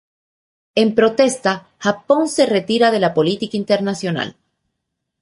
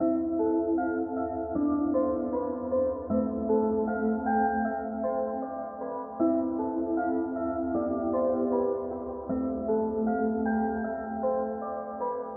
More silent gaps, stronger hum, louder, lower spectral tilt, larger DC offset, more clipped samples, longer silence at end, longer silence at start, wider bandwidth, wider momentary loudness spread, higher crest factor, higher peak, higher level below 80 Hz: neither; neither; first, -17 LUFS vs -29 LUFS; about the same, -4.5 dB/octave vs -3.5 dB/octave; neither; neither; first, 0.9 s vs 0 s; first, 0.75 s vs 0 s; first, 11.5 kHz vs 2.2 kHz; about the same, 8 LU vs 6 LU; about the same, 16 dB vs 14 dB; first, -2 dBFS vs -14 dBFS; second, -60 dBFS vs -54 dBFS